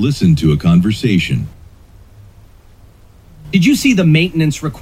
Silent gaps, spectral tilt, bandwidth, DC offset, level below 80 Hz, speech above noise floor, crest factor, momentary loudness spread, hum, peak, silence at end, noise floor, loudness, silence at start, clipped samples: none; -6 dB/octave; 15.5 kHz; under 0.1%; -36 dBFS; 30 dB; 14 dB; 7 LU; none; 0 dBFS; 0 s; -42 dBFS; -13 LUFS; 0 s; under 0.1%